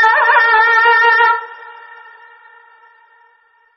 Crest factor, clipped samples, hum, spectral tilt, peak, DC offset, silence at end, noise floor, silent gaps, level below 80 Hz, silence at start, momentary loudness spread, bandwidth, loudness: 14 dB; under 0.1%; none; 6 dB/octave; 0 dBFS; under 0.1%; 2.05 s; -53 dBFS; none; -66 dBFS; 0 s; 9 LU; 6.4 kHz; -10 LUFS